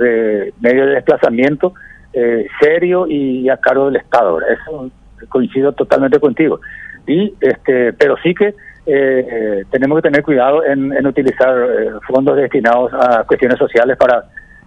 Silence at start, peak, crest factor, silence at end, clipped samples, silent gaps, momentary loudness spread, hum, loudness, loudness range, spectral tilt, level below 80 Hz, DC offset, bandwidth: 0 s; 0 dBFS; 12 dB; 0.25 s; 0.3%; none; 6 LU; none; -13 LUFS; 2 LU; -7.5 dB/octave; -46 dBFS; under 0.1%; 7.8 kHz